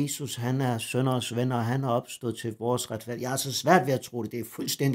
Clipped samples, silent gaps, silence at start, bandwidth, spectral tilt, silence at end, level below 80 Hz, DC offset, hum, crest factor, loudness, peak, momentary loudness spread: under 0.1%; none; 0 s; 16 kHz; -5 dB/octave; 0 s; -70 dBFS; under 0.1%; none; 20 dB; -28 LUFS; -8 dBFS; 11 LU